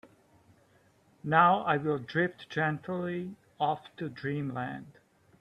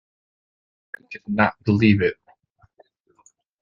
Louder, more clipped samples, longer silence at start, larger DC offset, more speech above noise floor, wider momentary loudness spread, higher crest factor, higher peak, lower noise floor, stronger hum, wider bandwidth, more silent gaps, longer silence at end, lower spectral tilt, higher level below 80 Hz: second, -30 LUFS vs -20 LUFS; neither; second, 0.05 s vs 1.1 s; neither; second, 35 dB vs 40 dB; second, 16 LU vs 24 LU; about the same, 22 dB vs 22 dB; second, -10 dBFS vs -2 dBFS; first, -65 dBFS vs -60 dBFS; neither; first, 9.4 kHz vs 7.2 kHz; neither; second, 0.5 s vs 1.5 s; about the same, -7.5 dB/octave vs -8.5 dB/octave; second, -72 dBFS vs -58 dBFS